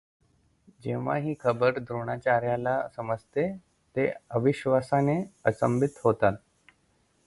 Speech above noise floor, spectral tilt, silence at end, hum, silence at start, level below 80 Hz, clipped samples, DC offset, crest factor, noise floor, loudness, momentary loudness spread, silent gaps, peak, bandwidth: 41 dB; -8 dB/octave; 0.9 s; none; 0.85 s; -60 dBFS; under 0.1%; under 0.1%; 20 dB; -68 dBFS; -28 LUFS; 9 LU; none; -8 dBFS; 11.5 kHz